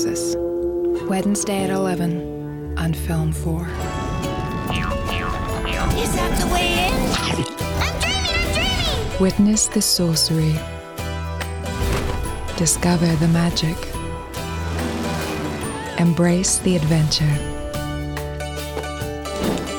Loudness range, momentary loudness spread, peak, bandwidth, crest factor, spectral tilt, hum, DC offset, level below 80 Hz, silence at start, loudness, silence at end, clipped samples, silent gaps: 5 LU; 11 LU; -6 dBFS; over 20 kHz; 16 dB; -4.5 dB/octave; none; under 0.1%; -32 dBFS; 0 s; -21 LUFS; 0 s; under 0.1%; none